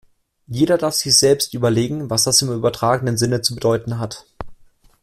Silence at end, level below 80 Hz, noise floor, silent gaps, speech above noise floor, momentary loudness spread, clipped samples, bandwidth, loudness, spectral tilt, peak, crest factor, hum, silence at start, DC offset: 0.5 s; -48 dBFS; -48 dBFS; none; 30 dB; 17 LU; under 0.1%; 16 kHz; -17 LUFS; -3.5 dB/octave; 0 dBFS; 18 dB; none; 0.5 s; under 0.1%